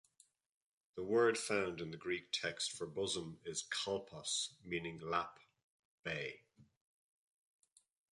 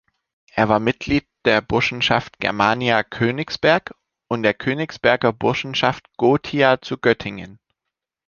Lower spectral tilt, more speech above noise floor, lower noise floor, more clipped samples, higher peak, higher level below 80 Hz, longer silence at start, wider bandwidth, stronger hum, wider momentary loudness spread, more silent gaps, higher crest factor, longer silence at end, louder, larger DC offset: second, -3 dB/octave vs -5.5 dB/octave; second, 33 dB vs 64 dB; second, -73 dBFS vs -83 dBFS; neither; second, -20 dBFS vs -2 dBFS; second, -74 dBFS vs -50 dBFS; first, 0.95 s vs 0.55 s; first, 11.5 kHz vs 7.2 kHz; neither; first, 13 LU vs 6 LU; first, 5.63-6.03 s vs none; about the same, 22 dB vs 18 dB; first, 1.5 s vs 0.7 s; second, -40 LUFS vs -19 LUFS; neither